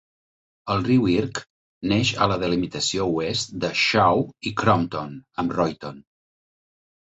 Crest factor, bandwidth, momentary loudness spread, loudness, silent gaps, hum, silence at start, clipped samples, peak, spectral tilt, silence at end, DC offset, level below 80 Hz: 20 dB; 8.2 kHz; 13 LU; -22 LUFS; 1.50-1.81 s; none; 0.65 s; under 0.1%; -4 dBFS; -5 dB/octave; 1.1 s; under 0.1%; -50 dBFS